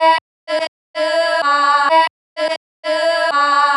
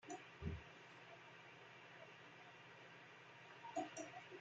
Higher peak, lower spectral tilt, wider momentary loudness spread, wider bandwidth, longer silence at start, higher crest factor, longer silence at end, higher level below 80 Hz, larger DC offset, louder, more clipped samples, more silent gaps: first, -2 dBFS vs -32 dBFS; second, 0 dB/octave vs -4.5 dB/octave; about the same, 10 LU vs 11 LU; first, 11.5 kHz vs 8.8 kHz; about the same, 0 s vs 0 s; second, 14 dB vs 22 dB; about the same, 0 s vs 0 s; second, under -90 dBFS vs -70 dBFS; neither; first, -16 LUFS vs -55 LUFS; neither; first, 0.21-0.47 s, 0.68-0.94 s, 2.10-2.36 s, 2.57-2.83 s vs none